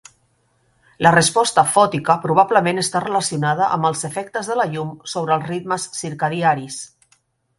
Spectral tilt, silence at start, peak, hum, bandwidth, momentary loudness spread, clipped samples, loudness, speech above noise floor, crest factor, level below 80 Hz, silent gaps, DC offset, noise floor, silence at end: -4 dB/octave; 1 s; 0 dBFS; none; 11.5 kHz; 11 LU; under 0.1%; -18 LUFS; 44 dB; 20 dB; -58 dBFS; none; under 0.1%; -63 dBFS; 0.75 s